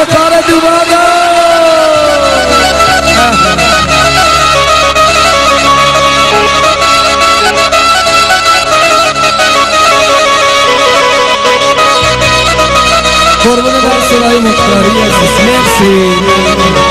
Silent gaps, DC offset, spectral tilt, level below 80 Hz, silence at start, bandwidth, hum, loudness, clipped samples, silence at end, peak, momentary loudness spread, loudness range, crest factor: none; 0.4%; -3 dB/octave; -26 dBFS; 0 s; 16 kHz; none; -6 LUFS; 1%; 0 s; 0 dBFS; 2 LU; 1 LU; 6 dB